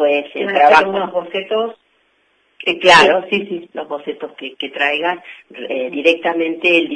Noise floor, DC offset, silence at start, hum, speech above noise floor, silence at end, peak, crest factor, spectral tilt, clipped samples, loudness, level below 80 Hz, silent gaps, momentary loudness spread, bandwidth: -60 dBFS; under 0.1%; 0 s; none; 44 dB; 0 s; 0 dBFS; 16 dB; -3.5 dB/octave; under 0.1%; -15 LUFS; -58 dBFS; none; 18 LU; 10.5 kHz